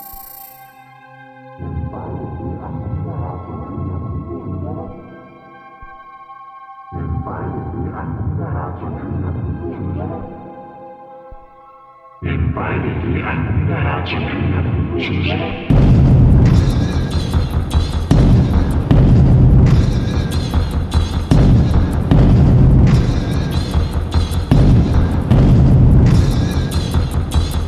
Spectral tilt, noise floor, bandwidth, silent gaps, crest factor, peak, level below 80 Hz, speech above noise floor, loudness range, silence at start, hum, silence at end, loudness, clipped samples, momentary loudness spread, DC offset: -8 dB/octave; -42 dBFS; 15 kHz; none; 14 dB; 0 dBFS; -20 dBFS; 24 dB; 14 LU; 0 s; none; 0 s; -16 LUFS; under 0.1%; 18 LU; under 0.1%